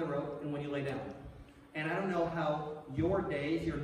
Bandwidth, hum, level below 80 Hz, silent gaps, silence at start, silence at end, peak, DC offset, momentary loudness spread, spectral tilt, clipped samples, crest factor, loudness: 10.5 kHz; none; -56 dBFS; none; 0 s; 0 s; -22 dBFS; under 0.1%; 13 LU; -7.5 dB/octave; under 0.1%; 14 dB; -36 LUFS